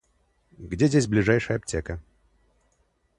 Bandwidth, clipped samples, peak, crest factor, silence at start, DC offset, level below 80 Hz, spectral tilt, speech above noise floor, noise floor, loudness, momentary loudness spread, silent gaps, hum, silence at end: 11.5 kHz; under 0.1%; -6 dBFS; 20 dB; 0.6 s; under 0.1%; -46 dBFS; -6 dB/octave; 45 dB; -68 dBFS; -24 LUFS; 17 LU; none; none; 1.2 s